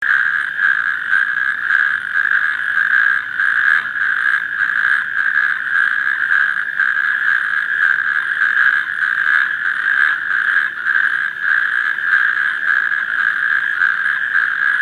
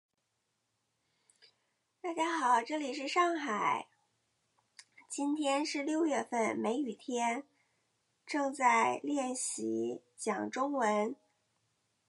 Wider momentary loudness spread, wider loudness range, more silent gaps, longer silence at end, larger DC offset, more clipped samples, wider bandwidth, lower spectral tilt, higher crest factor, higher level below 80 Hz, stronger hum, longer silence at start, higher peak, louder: second, 3 LU vs 10 LU; about the same, 1 LU vs 2 LU; neither; second, 0 s vs 0.95 s; neither; neither; first, 13 kHz vs 11.5 kHz; second, -0.5 dB/octave vs -3 dB/octave; about the same, 16 dB vs 20 dB; first, -70 dBFS vs -90 dBFS; neither; second, 0 s vs 2.05 s; first, 0 dBFS vs -16 dBFS; first, -15 LUFS vs -33 LUFS